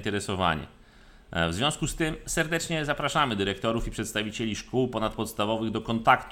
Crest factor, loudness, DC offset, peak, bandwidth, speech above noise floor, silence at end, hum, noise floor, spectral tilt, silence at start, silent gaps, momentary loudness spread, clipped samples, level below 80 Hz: 22 dB; -28 LUFS; under 0.1%; -6 dBFS; 17.5 kHz; 25 dB; 0 s; none; -53 dBFS; -4 dB/octave; 0 s; none; 6 LU; under 0.1%; -44 dBFS